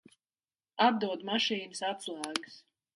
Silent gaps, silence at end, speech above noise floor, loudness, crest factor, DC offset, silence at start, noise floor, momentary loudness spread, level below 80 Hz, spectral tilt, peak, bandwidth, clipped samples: none; 0.35 s; over 58 dB; -32 LUFS; 22 dB; under 0.1%; 0.75 s; under -90 dBFS; 11 LU; -82 dBFS; -3 dB/octave; -12 dBFS; 11.5 kHz; under 0.1%